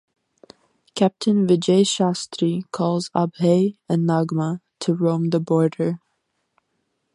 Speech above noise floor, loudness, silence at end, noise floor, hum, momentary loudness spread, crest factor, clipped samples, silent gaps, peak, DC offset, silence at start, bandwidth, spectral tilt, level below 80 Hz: 53 dB; -21 LUFS; 1.15 s; -73 dBFS; none; 8 LU; 16 dB; under 0.1%; none; -4 dBFS; under 0.1%; 0.95 s; 11 kHz; -6.5 dB/octave; -66 dBFS